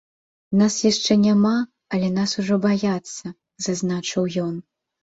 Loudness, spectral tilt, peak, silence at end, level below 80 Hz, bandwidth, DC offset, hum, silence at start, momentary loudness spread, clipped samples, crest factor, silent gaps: -21 LUFS; -5 dB/octave; -4 dBFS; 0.45 s; -60 dBFS; 8 kHz; under 0.1%; none; 0.5 s; 12 LU; under 0.1%; 18 dB; none